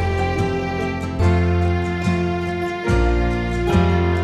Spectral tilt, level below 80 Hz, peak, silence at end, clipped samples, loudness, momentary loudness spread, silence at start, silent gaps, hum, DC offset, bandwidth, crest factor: -7.5 dB/octave; -26 dBFS; -4 dBFS; 0 s; under 0.1%; -20 LUFS; 6 LU; 0 s; none; none; under 0.1%; 10 kHz; 14 dB